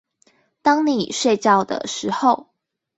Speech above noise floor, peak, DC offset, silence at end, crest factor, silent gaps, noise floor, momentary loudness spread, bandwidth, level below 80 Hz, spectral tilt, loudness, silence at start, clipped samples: 42 dB; -2 dBFS; under 0.1%; 0.55 s; 18 dB; none; -61 dBFS; 8 LU; 8.2 kHz; -64 dBFS; -4 dB/octave; -19 LUFS; 0.65 s; under 0.1%